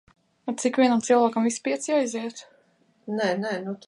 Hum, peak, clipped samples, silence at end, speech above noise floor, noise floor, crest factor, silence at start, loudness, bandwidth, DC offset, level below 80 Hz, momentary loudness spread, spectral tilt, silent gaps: none; -8 dBFS; under 0.1%; 0.1 s; 40 dB; -64 dBFS; 18 dB; 0.45 s; -24 LUFS; 11 kHz; under 0.1%; -76 dBFS; 16 LU; -4 dB/octave; none